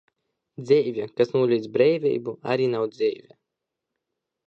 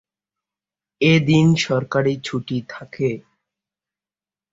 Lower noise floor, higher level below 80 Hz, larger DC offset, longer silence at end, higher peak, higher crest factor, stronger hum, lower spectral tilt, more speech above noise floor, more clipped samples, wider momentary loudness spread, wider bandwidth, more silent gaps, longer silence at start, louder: second, -84 dBFS vs under -90 dBFS; second, -74 dBFS vs -56 dBFS; neither; about the same, 1.3 s vs 1.35 s; second, -6 dBFS vs -2 dBFS; about the same, 18 dB vs 18 dB; neither; first, -7.5 dB/octave vs -6 dB/octave; second, 61 dB vs over 72 dB; neither; second, 8 LU vs 13 LU; about the same, 7.6 kHz vs 7.8 kHz; neither; second, 0.6 s vs 1 s; second, -23 LUFS vs -19 LUFS